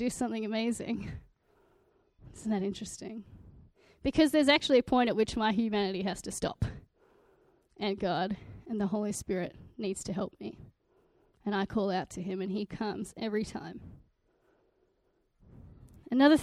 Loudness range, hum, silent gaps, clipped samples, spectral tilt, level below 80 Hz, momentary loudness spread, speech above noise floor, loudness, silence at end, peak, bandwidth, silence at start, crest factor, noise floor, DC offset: 11 LU; none; none; under 0.1%; -5 dB/octave; -56 dBFS; 16 LU; 43 dB; -32 LUFS; 0 s; -10 dBFS; 14 kHz; 0 s; 22 dB; -74 dBFS; under 0.1%